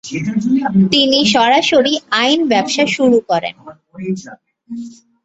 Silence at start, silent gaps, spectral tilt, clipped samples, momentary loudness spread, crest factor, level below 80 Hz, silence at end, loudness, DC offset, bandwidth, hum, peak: 0.05 s; none; -4.5 dB/octave; under 0.1%; 18 LU; 14 dB; -54 dBFS; 0.3 s; -13 LUFS; under 0.1%; 8.2 kHz; none; 0 dBFS